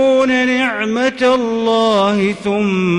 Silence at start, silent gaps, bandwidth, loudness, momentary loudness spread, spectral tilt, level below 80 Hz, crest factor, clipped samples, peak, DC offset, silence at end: 0 s; none; 11 kHz; -14 LUFS; 4 LU; -5.5 dB/octave; -52 dBFS; 8 dB; under 0.1%; -6 dBFS; under 0.1%; 0 s